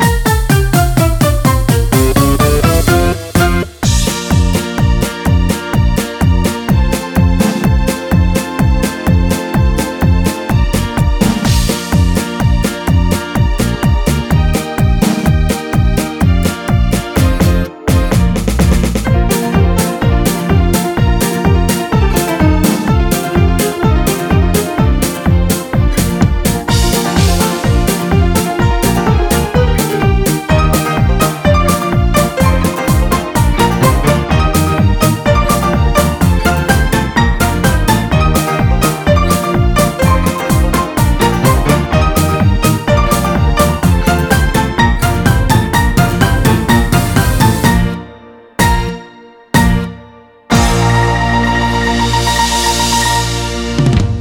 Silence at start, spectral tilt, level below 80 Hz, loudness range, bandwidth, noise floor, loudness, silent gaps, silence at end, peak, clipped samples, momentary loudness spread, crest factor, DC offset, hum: 0 s; -5.5 dB/octave; -16 dBFS; 2 LU; over 20 kHz; -38 dBFS; -12 LUFS; none; 0 s; 0 dBFS; under 0.1%; 3 LU; 10 dB; under 0.1%; none